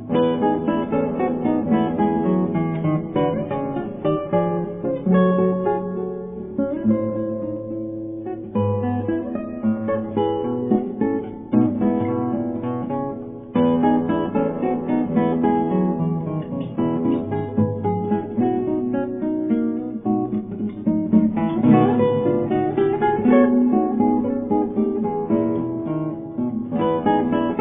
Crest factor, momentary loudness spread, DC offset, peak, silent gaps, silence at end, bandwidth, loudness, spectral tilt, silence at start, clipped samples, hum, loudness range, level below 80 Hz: 18 dB; 8 LU; under 0.1%; -4 dBFS; none; 0 s; 3.7 kHz; -21 LUFS; -12 dB/octave; 0 s; under 0.1%; none; 5 LU; -52 dBFS